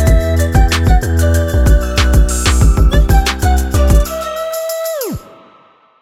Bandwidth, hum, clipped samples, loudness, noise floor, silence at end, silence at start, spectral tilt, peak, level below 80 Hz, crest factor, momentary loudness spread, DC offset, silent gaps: 16 kHz; none; under 0.1%; -13 LUFS; -47 dBFS; 0.8 s; 0 s; -5 dB/octave; 0 dBFS; -12 dBFS; 12 dB; 8 LU; under 0.1%; none